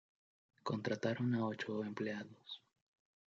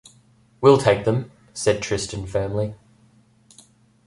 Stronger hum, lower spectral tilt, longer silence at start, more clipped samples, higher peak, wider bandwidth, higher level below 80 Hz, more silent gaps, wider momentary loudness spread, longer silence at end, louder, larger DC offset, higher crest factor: neither; about the same, -5.5 dB/octave vs -5.5 dB/octave; about the same, 0.65 s vs 0.6 s; neither; second, -22 dBFS vs -2 dBFS; second, 7.6 kHz vs 11.5 kHz; second, -86 dBFS vs -48 dBFS; neither; first, 15 LU vs 12 LU; second, 0.75 s vs 1.3 s; second, -41 LUFS vs -21 LUFS; neither; about the same, 20 dB vs 20 dB